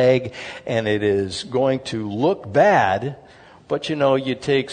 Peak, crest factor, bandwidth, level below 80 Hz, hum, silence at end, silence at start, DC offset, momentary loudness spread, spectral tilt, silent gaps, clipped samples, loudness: -2 dBFS; 18 dB; 9.6 kHz; -58 dBFS; none; 0 s; 0 s; under 0.1%; 12 LU; -6 dB/octave; none; under 0.1%; -20 LUFS